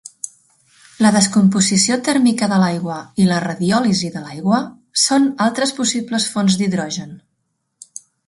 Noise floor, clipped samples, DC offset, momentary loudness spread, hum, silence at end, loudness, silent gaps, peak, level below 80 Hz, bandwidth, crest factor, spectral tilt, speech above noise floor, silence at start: -71 dBFS; under 0.1%; under 0.1%; 14 LU; none; 1.1 s; -16 LUFS; none; 0 dBFS; -58 dBFS; 11.5 kHz; 18 dB; -4 dB/octave; 54 dB; 0.05 s